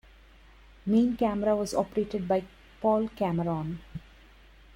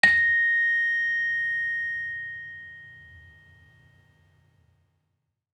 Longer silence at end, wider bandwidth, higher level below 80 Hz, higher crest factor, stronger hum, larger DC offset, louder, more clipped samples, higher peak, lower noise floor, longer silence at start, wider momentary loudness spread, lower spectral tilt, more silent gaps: second, 0.75 s vs 2.35 s; first, 16 kHz vs 11 kHz; first, -54 dBFS vs -70 dBFS; second, 18 dB vs 24 dB; neither; neither; second, -28 LUFS vs -23 LUFS; neither; second, -12 dBFS vs -4 dBFS; second, -54 dBFS vs -78 dBFS; first, 0.85 s vs 0.05 s; second, 13 LU vs 22 LU; first, -7 dB/octave vs -2 dB/octave; neither